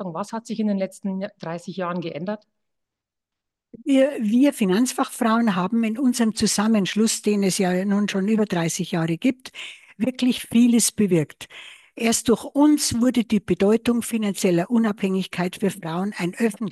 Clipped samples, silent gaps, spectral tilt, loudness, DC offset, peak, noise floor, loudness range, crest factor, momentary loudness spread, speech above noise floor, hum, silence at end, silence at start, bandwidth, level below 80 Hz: under 0.1%; none; -5 dB/octave; -22 LUFS; under 0.1%; -6 dBFS; -85 dBFS; 6 LU; 16 dB; 12 LU; 64 dB; none; 0 s; 0 s; 12.5 kHz; -58 dBFS